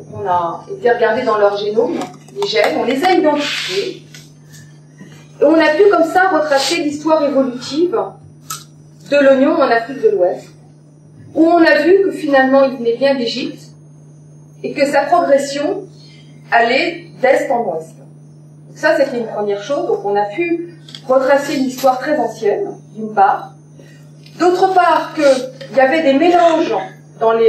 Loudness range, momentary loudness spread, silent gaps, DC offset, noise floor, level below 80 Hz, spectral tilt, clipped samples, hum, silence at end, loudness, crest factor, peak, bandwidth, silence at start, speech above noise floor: 4 LU; 12 LU; none; under 0.1%; -42 dBFS; -66 dBFS; -4.5 dB/octave; under 0.1%; none; 0 s; -14 LUFS; 14 dB; 0 dBFS; 14.5 kHz; 0 s; 28 dB